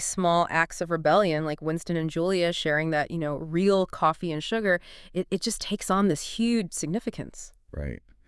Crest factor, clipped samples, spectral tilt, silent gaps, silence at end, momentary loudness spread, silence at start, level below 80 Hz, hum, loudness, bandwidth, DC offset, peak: 20 dB; under 0.1%; -4.5 dB/octave; none; 0.3 s; 13 LU; 0 s; -50 dBFS; none; -26 LUFS; 12 kHz; under 0.1%; -8 dBFS